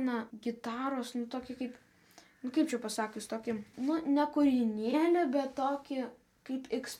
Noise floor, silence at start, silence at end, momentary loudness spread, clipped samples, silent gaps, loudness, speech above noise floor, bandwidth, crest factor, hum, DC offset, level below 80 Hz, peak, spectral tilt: -61 dBFS; 0 s; 0 s; 13 LU; under 0.1%; none; -34 LUFS; 28 dB; 15 kHz; 16 dB; none; under 0.1%; -74 dBFS; -18 dBFS; -4.5 dB/octave